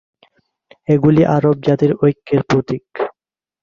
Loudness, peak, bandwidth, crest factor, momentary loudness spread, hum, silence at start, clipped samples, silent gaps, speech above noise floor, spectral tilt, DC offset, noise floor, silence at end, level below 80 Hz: -16 LUFS; -2 dBFS; 7.2 kHz; 14 dB; 13 LU; none; 0.9 s; under 0.1%; none; 65 dB; -8.5 dB/octave; under 0.1%; -79 dBFS; 0.5 s; -50 dBFS